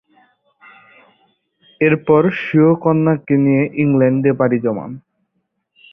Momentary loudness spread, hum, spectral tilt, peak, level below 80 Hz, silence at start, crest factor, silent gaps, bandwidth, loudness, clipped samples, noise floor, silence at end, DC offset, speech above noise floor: 8 LU; none; -11 dB/octave; -2 dBFS; -56 dBFS; 1.8 s; 16 dB; none; 3.7 kHz; -15 LUFS; under 0.1%; -70 dBFS; 0.95 s; under 0.1%; 56 dB